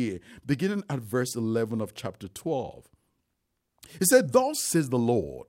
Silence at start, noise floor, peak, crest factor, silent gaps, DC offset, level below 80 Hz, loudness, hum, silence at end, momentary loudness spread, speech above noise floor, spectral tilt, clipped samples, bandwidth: 0 s; -79 dBFS; -8 dBFS; 20 dB; none; under 0.1%; -60 dBFS; -26 LUFS; none; 0.05 s; 16 LU; 52 dB; -4.5 dB/octave; under 0.1%; 16.5 kHz